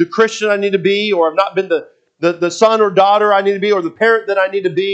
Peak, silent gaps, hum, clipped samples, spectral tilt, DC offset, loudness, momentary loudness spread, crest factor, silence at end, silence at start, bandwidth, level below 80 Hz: 0 dBFS; none; none; under 0.1%; -4.5 dB/octave; under 0.1%; -14 LUFS; 6 LU; 14 dB; 0 s; 0 s; 8.4 kHz; -70 dBFS